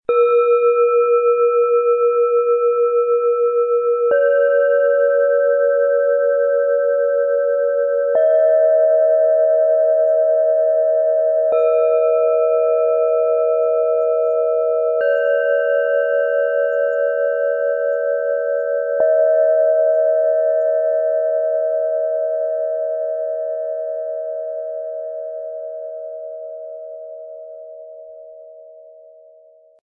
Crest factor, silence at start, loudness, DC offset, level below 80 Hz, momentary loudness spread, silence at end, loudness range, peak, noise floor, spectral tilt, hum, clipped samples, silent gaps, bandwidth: 10 dB; 0.1 s; -17 LUFS; under 0.1%; -78 dBFS; 13 LU; 1.05 s; 13 LU; -6 dBFS; -49 dBFS; -5 dB/octave; none; under 0.1%; none; 3.9 kHz